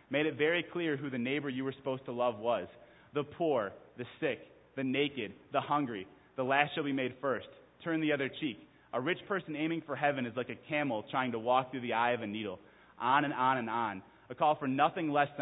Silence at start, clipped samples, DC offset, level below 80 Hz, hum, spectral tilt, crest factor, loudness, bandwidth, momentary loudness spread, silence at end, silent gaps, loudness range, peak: 0.1 s; under 0.1%; under 0.1%; -74 dBFS; none; -1.5 dB/octave; 24 dB; -34 LUFS; 3.9 kHz; 12 LU; 0 s; none; 3 LU; -10 dBFS